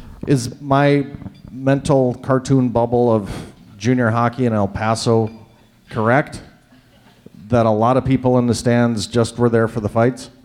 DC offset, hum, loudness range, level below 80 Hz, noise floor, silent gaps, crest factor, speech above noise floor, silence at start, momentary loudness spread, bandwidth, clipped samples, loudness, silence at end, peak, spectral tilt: under 0.1%; none; 3 LU; -44 dBFS; -50 dBFS; none; 14 dB; 33 dB; 0 s; 11 LU; 12.5 kHz; under 0.1%; -17 LUFS; 0.15 s; -4 dBFS; -6.5 dB/octave